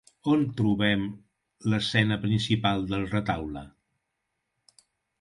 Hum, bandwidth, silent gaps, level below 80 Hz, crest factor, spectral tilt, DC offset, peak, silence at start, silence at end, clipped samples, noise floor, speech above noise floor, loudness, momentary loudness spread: none; 11.5 kHz; none; -52 dBFS; 20 dB; -6.5 dB/octave; under 0.1%; -8 dBFS; 0.25 s; 1.55 s; under 0.1%; -81 dBFS; 55 dB; -27 LUFS; 9 LU